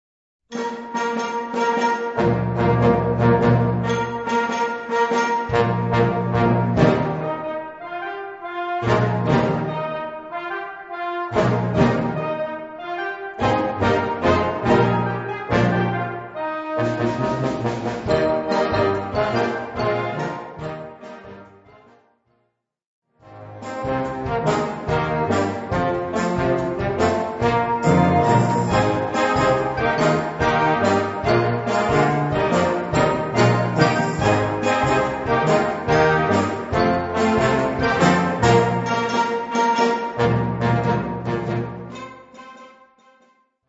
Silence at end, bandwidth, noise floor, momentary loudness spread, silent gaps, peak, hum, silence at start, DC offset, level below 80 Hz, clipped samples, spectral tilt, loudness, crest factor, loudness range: 1 s; 8 kHz; -71 dBFS; 11 LU; 22.86-23.02 s; -2 dBFS; none; 0.5 s; under 0.1%; -42 dBFS; under 0.1%; -6.5 dB/octave; -20 LUFS; 18 dB; 6 LU